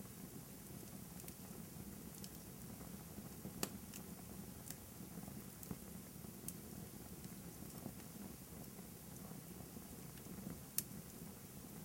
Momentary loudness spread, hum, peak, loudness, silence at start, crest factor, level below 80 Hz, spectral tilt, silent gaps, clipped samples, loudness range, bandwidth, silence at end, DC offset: 7 LU; none; -14 dBFS; -51 LUFS; 0 s; 38 dB; -66 dBFS; -4 dB/octave; none; under 0.1%; 3 LU; 16.5 kHz; 0 s; under 0.1%